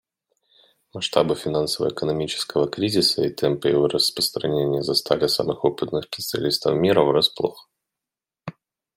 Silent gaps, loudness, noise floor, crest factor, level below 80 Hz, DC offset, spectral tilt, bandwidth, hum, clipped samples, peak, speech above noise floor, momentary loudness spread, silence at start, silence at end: none; -22 LUFS; -88 dBFS; 22 dB; -58 dBFS; under 0.1%; -4.5 dB/octave; 16.5 kHz; none; under 0.1%; -2 dBFS; 67 dB; 9 LU; 0.95 s; 0.45 s